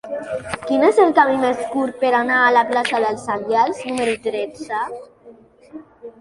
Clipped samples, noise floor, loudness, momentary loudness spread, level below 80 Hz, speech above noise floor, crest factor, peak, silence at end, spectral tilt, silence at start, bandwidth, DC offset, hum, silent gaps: under 0.1%; -46 dBFS; -18 LUFS; 13 LU; -58 dBFS; 28 dB; 18 dB; -2 dBFS; 0.1 s; -4 dB/octave; 0.05 s; 11.5 kHz; under 0.1%; none; none